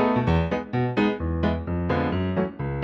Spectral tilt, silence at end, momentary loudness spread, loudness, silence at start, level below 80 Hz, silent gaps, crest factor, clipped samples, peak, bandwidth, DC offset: -9 dB/octave; 0 s; 4 LU; -25 LUFS; 0 s; -38 dBFS; none; 16 dB; under 0.1%; -8 dBFS; 6.4 kHz; under 0.1%